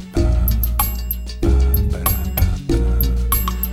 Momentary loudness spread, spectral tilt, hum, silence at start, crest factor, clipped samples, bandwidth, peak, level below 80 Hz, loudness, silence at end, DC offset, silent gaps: 3 LU; -6 dB/octave; none; 0 s; 16 dB; under 0.1%; 18 kHz; -2 dBFS; -18 dBFS; -19 LUFS; 0 s; under 0.1%; none